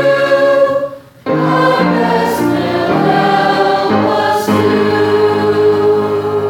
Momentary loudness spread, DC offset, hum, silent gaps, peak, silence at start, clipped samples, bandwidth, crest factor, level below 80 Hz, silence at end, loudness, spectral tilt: 4 LU; under 0.1%; none; none; 0 dBFS; 0 s; under 0.1%; 17 kHz; 12 dB; -54 dBFS; 0 s; -12 LUFS; -6 dB/octave